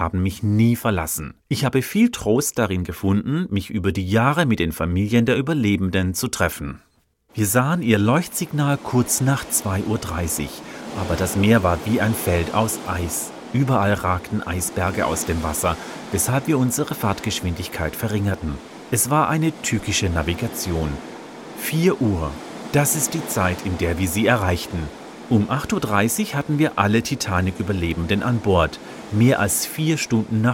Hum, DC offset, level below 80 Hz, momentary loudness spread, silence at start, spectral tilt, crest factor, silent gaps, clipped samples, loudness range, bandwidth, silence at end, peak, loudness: none; under 0.1%; -40 dBFS; 8 LU; 0 s; -5 dB/octave; 20 dB; none; under 0.1%; 2 LU; 17 kHz; 0 s; -2 dBFS; -21 LUFS